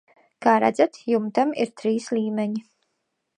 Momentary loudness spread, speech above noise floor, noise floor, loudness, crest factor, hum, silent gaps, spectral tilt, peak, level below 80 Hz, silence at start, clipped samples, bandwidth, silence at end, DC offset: 8 LU; 54 dB; -76 dBFS; -23 LUFS; 20 dB; none; none; -6 dB/octave; -4 dBFS; -72 dBFS; 0.4 s; under 0.1%; 10 kHz; 0.75 s; under 0.1%